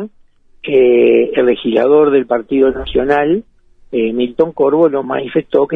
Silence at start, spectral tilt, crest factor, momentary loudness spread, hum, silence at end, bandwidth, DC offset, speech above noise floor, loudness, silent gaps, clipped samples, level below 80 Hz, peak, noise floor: 0 s; -8.5 dB/octave; 12 dB; 8 LU; none; 0 s; 4 kHz; under 0.1%; 35 dB; -13 LUFS; none; under 0.1%; -42 dBFS; 0 dBFS; -47 dBFS